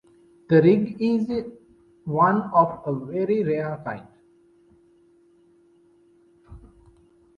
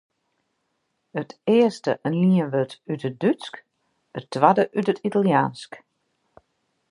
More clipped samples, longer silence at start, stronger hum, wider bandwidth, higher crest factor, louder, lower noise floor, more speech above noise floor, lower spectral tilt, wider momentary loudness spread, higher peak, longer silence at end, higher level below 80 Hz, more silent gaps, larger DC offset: neither; second, 0.5 s vs 1.15 s; neither; second, 6.4 kHz vs 11 kHz; about the same, 20 dB vs 22 dB; about the same, -22 LUFS vs -22 LUFS; second, -58 dBFS vs -74 dBFS; second, 37 dB vs 53 dB; first, -9.5 dB/octave vs -7.5 dB/octave; about the same, 16 LU vs 17 LU; second, -6 dBFS vs -2 dBFS; second, 0.8 s vs 1.15 s; first, -58 dBFS vs -72 dBFS; neither; neither